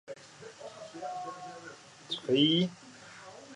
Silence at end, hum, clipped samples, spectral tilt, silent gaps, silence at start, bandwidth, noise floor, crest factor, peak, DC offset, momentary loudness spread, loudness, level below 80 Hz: 0 s; none; under 0.1%; -5.5 dB/octave; none; 0.05 s; 11 kHz; -51 dBFS; 20 dB; -14 dBFS; under 0.1%; 24 LU; -30 LUFS; -78 dBFS